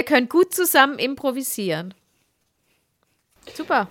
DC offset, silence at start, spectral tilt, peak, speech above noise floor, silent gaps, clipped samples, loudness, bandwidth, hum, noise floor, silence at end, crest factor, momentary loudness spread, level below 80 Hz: under 0.1%; 0 s; -3 dB/octave; 0 dBFS; 49 dB; none; under 0.1%; -20 LUFS; 17 kHz; none; -69 dBFS; 0.05 s; 22 dB; 18 LU; -68 dBFS